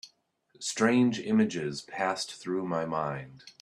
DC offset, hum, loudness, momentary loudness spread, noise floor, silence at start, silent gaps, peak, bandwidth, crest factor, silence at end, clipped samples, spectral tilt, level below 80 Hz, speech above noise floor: under 0.1%; none; -29 LUFS; 11 LU; -66 dBFS; 0.05 s; none; -10 dBFS; 12 kHz; 20 dB; 0.1 s; under 0.1%; -5 dB/octave; -70 dBFS; 37 dB